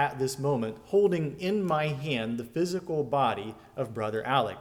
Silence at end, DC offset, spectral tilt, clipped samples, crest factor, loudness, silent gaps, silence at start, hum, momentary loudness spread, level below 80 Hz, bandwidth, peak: 0 s; under 0.1%; -6 dB/octave; under 0.1%; 16 dB; -29 LUFS; none; 0 s; none; 7 LU; -62 dBFS; 17 kHz; -12 dBFS